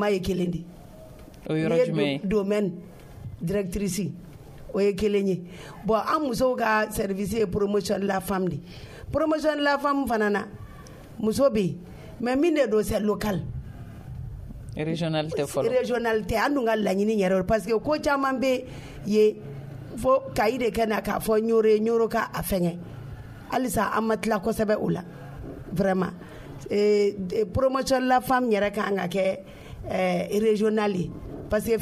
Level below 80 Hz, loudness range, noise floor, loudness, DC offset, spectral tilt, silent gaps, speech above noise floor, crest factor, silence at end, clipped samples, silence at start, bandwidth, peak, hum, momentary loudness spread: -46 dBFS; 4 LU; -45 dBFS; -25 LUFS; under 0.1%; -6 dB/octave; none; 20 dB; 16 dB; 0 s; under 0.1%; 0 s; 15.5 kHz; -10 dBFS; none; 18 LU